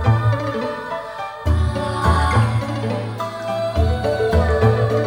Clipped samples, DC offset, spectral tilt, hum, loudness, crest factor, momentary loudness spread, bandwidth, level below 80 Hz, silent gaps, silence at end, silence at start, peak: under 0.1%; under 0.1%; -7 dB/octave; none; -20 LUFS; 16 dB; 10 LU; 11.5 kHz; -26 dBFS; none; 0 s; 0 s; -2 dBFS